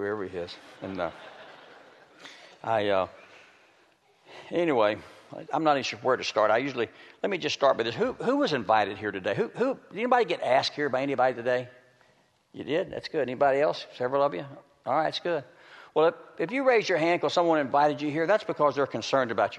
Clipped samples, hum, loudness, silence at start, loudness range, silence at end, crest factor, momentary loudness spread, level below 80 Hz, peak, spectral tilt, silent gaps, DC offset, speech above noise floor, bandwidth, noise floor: under 0.1%; none; -27 LUFS; 0 s; 7 LU; 0 s; 20 dB; 14 LU; -70 dBFS; -8 dBFS; -5 dB/octave; none; under 0.1%; 38 dB; 9.6 kHz; -65 dBFS